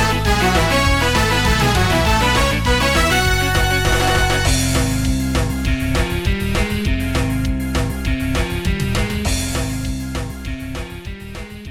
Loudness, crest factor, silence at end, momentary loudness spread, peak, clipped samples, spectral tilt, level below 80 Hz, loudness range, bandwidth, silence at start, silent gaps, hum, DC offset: -17 LUFS; 14 dB; 0 s; 12 LU; -2 dBFS; under 0.1%; -4.5 dB/octave; -24 dBFS; 7 LU; 18 kHz; 0 s; none; none; under 0.1%